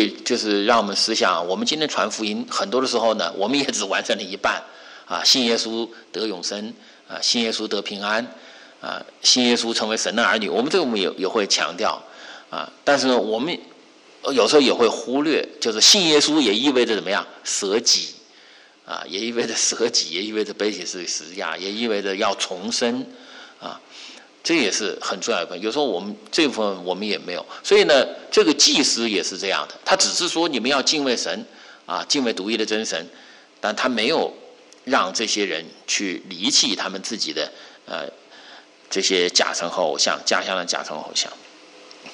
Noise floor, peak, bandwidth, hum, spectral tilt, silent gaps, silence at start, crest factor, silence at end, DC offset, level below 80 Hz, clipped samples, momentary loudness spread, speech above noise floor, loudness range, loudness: -49 dBFS; -4 dBFS; 11.5 kHz; none; -1.5 dB/octave; none; 0 s; 18 dB; 0 s; under 0.1%; -70 dBFS; under 0.1%; 15 LU; 28 dB; 7 LU; -20 LUFS